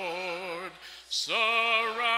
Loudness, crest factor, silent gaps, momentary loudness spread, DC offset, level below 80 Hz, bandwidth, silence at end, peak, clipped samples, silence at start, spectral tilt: -27 LUFS; 16 dB; none; 15 LU; under 0.1%; -72 dBFS; 16 kHz; 0 s; -14 dBFS; under 0.1%; 0 s; -0.5 dB/octave